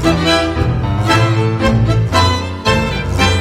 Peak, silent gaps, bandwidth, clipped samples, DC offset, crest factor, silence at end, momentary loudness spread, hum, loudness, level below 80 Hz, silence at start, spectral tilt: 0 dBFS; none; 15 kHz; under 0.1%; under 0.1%; 12 dB; 0 s; 4 LU; none; -14 LUFS; -26 dBFS; 0 s; -5.5 dB/octave